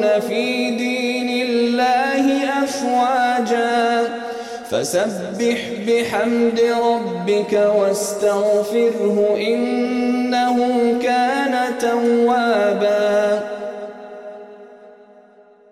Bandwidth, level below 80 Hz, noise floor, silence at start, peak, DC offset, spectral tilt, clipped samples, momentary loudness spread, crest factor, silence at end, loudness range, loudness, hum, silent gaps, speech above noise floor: 14 kHz; -64 dBFS; -49 dBFS; 0 s; -6 dBFS; under 0.1%; -4 dB/octave; under 0.1%; 7 LU; 12 dB; 0.8 s; 2 LU; -18 LUFS; none; none; 31 dB